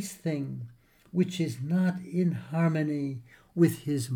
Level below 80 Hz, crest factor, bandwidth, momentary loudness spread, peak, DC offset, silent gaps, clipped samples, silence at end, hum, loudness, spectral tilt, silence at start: -68 dBFS; 18 dB; 18 kHz; 12 LU; -10 dBFS; under 0.1%; none; under 0.1%; 0 s; none; -29 LUFS; -7 dB/octave; 0 s